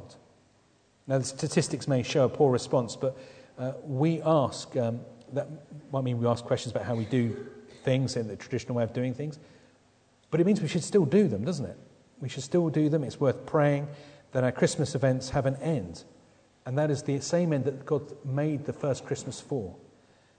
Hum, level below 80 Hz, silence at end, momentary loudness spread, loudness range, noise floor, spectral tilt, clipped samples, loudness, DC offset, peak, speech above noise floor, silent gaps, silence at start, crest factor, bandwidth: none; -62 dBFS; 0.6 s; 14 LU; 4 LU; -64 dBFS; -6.5 dB/octave; under 0.1%; -29 LUFS; under 0.1%; -10 dBFS; 36 dB; none; 0 s; 18 dB; 9.4 kHz